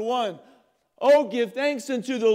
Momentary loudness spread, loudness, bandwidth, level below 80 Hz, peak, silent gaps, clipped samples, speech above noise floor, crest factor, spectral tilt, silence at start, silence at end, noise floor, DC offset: 9 LU; -23 LUFS; 15 kHz; -86 dBFS; -8 dBFS; none; under 0.1%; 26 dB; 14 dB; -4 dB/octave; 0 s; 0 s; -49 dBFS; under 0.1%